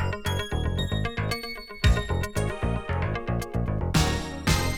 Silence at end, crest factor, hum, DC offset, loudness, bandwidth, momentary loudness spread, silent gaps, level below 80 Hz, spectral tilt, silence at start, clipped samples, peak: 0 s; 18 dB; none; under 0.1%; -28 LUFS; 18.5 kHz; 5 LU; none; -32 dBFS; -5 dB/octave; 0 s; under 0.1%; -8 dBFS